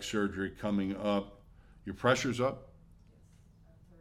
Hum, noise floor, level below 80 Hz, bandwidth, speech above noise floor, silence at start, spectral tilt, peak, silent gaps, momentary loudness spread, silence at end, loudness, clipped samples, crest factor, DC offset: none; -60 dBFS; -58 dBFS; 14.5 kHz; 27 dB; 0 s; -5 dB/octave; -14 dBFS; none; 18 LU; 1.35 s; -33 LUFS; under 0.1%; 20 dB; under 0.1%